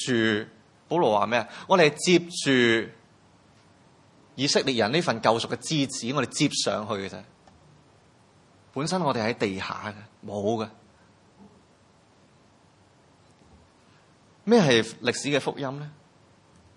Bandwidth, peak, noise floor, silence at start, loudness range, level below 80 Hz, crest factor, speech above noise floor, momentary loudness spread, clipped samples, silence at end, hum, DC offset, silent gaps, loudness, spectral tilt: 11.5 kHz; -4 dBFS; -59 dBFS; 0 s; 10 LU; -70 dBFS; 24 dB; 34 dB; 17 LU; under 0.1%; 0.85 s; none; under 0.1%; none; -25 LUFS; -4 dB/octave